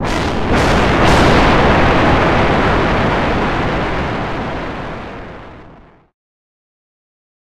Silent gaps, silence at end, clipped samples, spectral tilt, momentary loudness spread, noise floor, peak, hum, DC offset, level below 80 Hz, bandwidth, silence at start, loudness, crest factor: none; 1.35 s; under 0.1%; -6 dB/octave; 16 LU; -41 dBFS; -2 dBFS; none; 2%; -24 dBFS; 14 kHz; 0 s; -13 LUFS; 14 dB